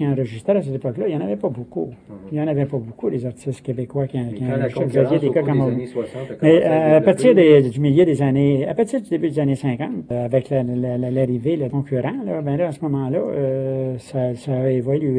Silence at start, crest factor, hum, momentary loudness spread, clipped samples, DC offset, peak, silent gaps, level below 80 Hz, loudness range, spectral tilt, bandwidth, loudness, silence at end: 0 s; 18 dB; none; 11 LU; under 0.1%; under 0.1%; 0 dBFS; none; -56 dBFS; 9 LU; -8.5 dB/octave; 10.5 kHz; -20 LUFS; 0 s